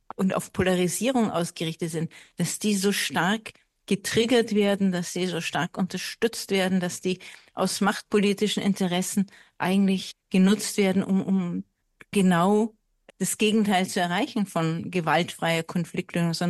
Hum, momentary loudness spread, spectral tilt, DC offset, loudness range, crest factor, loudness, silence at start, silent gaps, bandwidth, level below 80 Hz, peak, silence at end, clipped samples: none; 9 LU; -5 dB/octave; under 0.1%; 2 LU; 16 dB; -25 LUFS; 0.2 s; none; 12.5 kHz; -64 dBFS; -8 dBFS; 0 s; under 0.1%